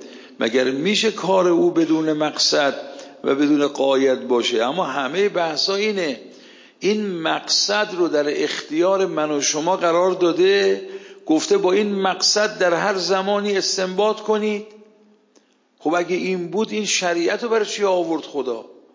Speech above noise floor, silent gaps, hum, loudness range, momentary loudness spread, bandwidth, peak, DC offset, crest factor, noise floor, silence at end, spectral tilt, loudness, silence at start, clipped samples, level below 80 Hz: 39 dB; none; none; 4 LU; 8 LU; 7.6 kHz; -6 dBFS; under 0.1%; 14 dB; -58 dBFS; 0.2 s; -3 dB/octave; -19 LUFS; 0 s; under 0.1%; -76 dBFS